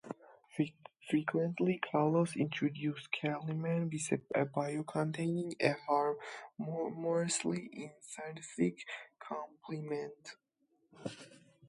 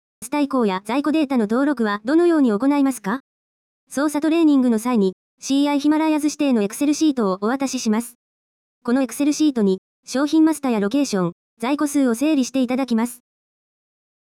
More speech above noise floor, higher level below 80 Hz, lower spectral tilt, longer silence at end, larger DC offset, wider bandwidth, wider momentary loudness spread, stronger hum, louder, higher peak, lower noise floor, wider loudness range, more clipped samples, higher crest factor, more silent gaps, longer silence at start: second, 36 dB vs over 71 dB; second, -80 dBFS vs -66 dBFS; about the same, -5.5 dB/octave vs -5 dB/octave; second, 0 s vs 1.2 s; neither; second, 11.5 kHz vs 15.5 kHz; first, 14 LU vs 9 LU; neither; second, -36 LUFS vs -20 LUFS; second, -14 dBFS vs -8 dBFS; second, -72 dBFS vs under -90 dBFS; first, 7 LU vs 2 LU; neither; first, 24 dB vs 12 dB; second, none vs 3.20-3.87 s, 5.13-5.38 s, 8.15-8.81 s, 9.78-10.03 s, 11.32-11.57 s; second, 0.05 s vs 0.2 s